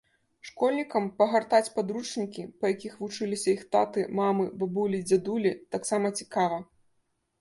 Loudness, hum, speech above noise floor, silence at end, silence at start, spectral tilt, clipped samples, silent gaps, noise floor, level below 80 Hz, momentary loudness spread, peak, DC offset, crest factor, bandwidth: -28 LUFS; none; 46 dB; 0.8 s; 0.45 s; -5 dB/octave; under 0.1%; none; -74 dBFS; -72 dBFS; 9 LU; -10 dBFS; under 0.1%; 20 dB; 11.5 kHz